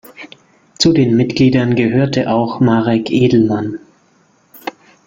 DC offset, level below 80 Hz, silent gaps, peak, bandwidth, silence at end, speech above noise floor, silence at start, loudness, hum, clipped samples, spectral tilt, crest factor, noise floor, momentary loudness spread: under 0.1%; -48 dBFS; none; 0 dBFS; 16.5 kHz; 0.35 s; 41 dB; 0.1 s; -13 LUFS; none; under 0.1%; -6.5 dB/octave; 14 dB; -54 dBFS; 17 LU